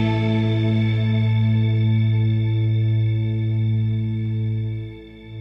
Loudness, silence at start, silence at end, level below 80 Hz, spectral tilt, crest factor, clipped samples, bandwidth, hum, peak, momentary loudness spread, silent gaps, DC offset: -21 LUFS; 0 s; 0 s; -44 dBFS; -9.5 dB/octave; 8 dB; under 0.1%; 5.4 kHz; none; -10 dBFS; 7 LU; none; under 0.1%